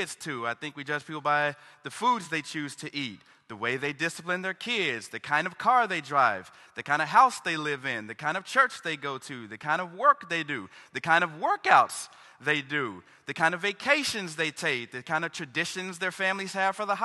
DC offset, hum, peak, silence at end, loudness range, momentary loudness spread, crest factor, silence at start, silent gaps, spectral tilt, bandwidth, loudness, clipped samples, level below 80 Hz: under 0.1%; none; -4 dBFS; 0 s; 5 LU; 13 LU; 24 dB; 0 s; none; -3 dB/octave; 12.5 kHz; -28 LUFS; under 0.1%; -74 dBFS